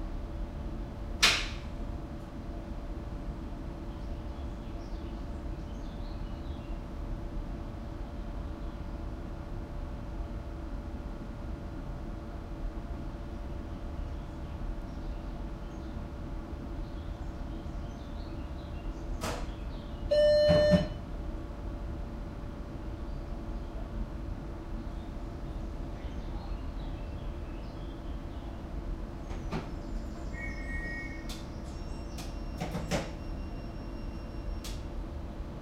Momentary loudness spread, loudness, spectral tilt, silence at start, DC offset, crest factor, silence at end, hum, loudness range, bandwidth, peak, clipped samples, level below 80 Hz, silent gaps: 7 LU; -37 LUFS; -5 dB/octave; 0 s; under 0.1%; 28 dB; 0 s; none; 12 LU; 15.5 kHz; -8 dBFS; under 0.1%; -40 dBFS; none